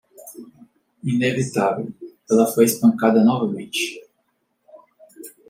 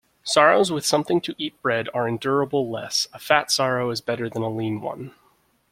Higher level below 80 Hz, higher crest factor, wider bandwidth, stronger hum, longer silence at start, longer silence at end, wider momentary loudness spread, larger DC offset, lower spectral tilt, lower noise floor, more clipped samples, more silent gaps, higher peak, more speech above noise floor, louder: about the same, -66 dBFS vs -62 dBFS; about the same, 20 dB vs 22 dB; about the same, 16.5 kHz vs 16 kHz; neither; about the same, 0.25 s vs 0.25 s; second, 0.2 s vs 0.6 s; first, 24 LU vs 11 LU; neither; first, -5 dB/octave vs -3.5 dB/octave; first, -70 dBFS vs -63 dBFS; neither; neither; about the same, -2 dBFS vs -2 dBFS; first, 52 dB vs 40 dB; first, -19 LUFS vs -22 LUFS